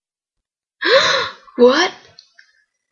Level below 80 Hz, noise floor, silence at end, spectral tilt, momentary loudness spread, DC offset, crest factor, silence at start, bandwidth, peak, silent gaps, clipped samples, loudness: -64 dBFS; -82 dBFS; 1 s; -2 dB/octave; 9 LU; under 0.1%; 18 dB; 0.8 s; 7.2 kHz; 0 dBFS; none; under 0.1%; -15 LUFS